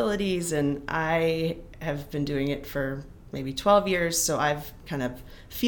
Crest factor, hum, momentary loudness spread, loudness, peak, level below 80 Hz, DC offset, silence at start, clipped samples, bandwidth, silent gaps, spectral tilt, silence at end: 20 dB; none; 13 LU; -27 LUFS; -8 dBFS; -46 dBFS; under 0.1%; 0 s; under 0.1%; 19 kHz; none; -4.5 dB/octave; 0 s